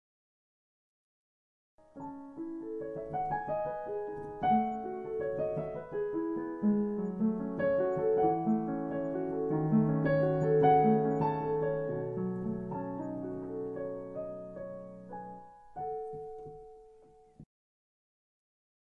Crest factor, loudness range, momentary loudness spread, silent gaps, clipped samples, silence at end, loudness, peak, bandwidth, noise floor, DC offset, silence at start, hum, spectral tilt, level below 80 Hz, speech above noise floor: 20 dB; 16 LU; 17 LU; none; under 0.1%; 1.55 s; -32 LUFS; -14 dBFS; 4.9 kHz; -59 dBFS; under 0.1%; 1.95 s; none; -10.5 dB/octave; -62 dBFS; 21 dB